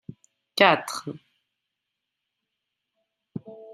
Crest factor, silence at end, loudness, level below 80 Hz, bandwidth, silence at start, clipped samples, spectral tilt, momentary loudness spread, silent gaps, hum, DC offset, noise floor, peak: 28 dB; 0 s; -22 LUFS; -74 dBFS; 13.5 kHz; 0.55 s; under 0.1%; -3.5 dB/octave; 22 LU; none; none; under 0.1%; -83 dBFS; -2 dBFS